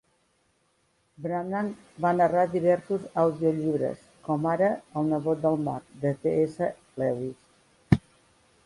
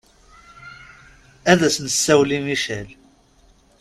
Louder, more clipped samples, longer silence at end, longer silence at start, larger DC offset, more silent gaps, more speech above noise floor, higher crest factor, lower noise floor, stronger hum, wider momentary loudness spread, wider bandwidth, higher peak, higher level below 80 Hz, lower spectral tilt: second, -27 LUFS vs -18 LUFS; neither; second, 0.65 s vs 0.85 s; first, 1.2 s vs 0.6 s; neither; neither; first, 43 dB vs 36 dB; about the same, 22 dB vs 22 dB; first, -69 dBFS vs -55 dBFS; neither; second, 9 LU vs 25 LU; second, 11.5 kHz vs 15 kHz; second, -4 dBFS vs 0 dBFS; about the same, -54 dBFS vs -52 dBFS; first, -8.5 dB/octave vs -3.5 dB/octave